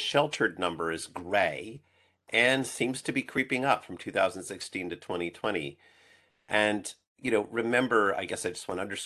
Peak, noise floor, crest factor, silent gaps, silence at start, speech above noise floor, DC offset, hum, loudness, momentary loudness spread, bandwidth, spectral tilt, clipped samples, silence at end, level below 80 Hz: -8 dBFS; -63 dBFS; 22 dB; 7.07-7.15 s; 0 s; 33 dB; under 0.1%; none; -29 LUFS; 11 LU; 12.5 kHz; -3.5 dB/octave; under 0.1%; 0 s; -64 dBFS